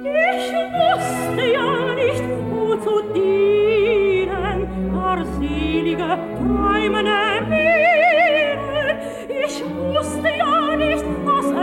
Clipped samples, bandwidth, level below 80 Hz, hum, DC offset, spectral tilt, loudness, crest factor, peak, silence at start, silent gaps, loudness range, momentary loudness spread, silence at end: under 0.1%; 16.5 kHz; -38 dBFS; none; under 0.1%; -5.5 dB/octave; -19 LUFS; 12 dB; -6 dBFS; 0 s; none; 3 LU; 8 LU; 0 s